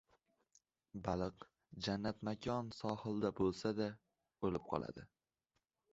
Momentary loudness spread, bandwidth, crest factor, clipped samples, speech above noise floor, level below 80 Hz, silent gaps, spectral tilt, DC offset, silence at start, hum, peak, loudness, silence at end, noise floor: 16 LU; 8 kHz; 22 dB; under 0.1%; 47 dB; -64 dBFS; none; -5.5 dB/octave; under 0.1%; 0.95 s; none; -22 dBFS; -42 LUFS; 0.85 s; -88 dBFS